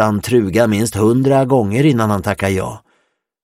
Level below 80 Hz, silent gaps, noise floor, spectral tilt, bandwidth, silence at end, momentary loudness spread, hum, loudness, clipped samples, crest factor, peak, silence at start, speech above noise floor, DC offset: -46 dBFS; none; -64 dBFS; -6.5 dB/octave; 16.5 kHz; 0.65 s; 5 LU; none; -15 LUFS; under 0.1%; 14 dB; 0 dBFS; 0 s; 50 dB; under 0.1%